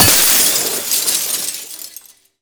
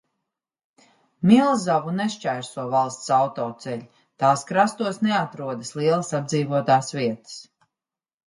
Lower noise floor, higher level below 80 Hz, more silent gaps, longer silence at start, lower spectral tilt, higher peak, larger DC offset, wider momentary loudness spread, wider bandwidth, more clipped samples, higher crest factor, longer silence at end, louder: second, -41 dBFS vs -89 dBFS; first, -46 dBFS vs -68 dBFS; neither; second, 0 s vs 1.2 s; second, -0.5 dB/octave vs -5.5 dB/octave; about the same, 0 dBFS vs -2 dBFS; neither; first, 21 LU vs 13 LU; first, over 20 kHz vs 11.5 kHz; neither; about the same, 16 dB vs 20 dB; second, 0.45 s vs 0.85 s; first, -12 LUFS vs -22 LUFS